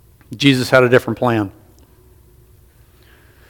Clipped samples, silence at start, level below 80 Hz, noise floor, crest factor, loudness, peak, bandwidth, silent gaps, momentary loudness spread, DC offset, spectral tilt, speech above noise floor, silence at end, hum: under 0.1%; 0.3 s; -52 dBFS; -49 dBFS; 18 dB; -15 LUFS; 0 dBFS; 18 kHz; none; 13 LU; under 0.1%; -5.5 dB/octave; 34 dB; 2 s; none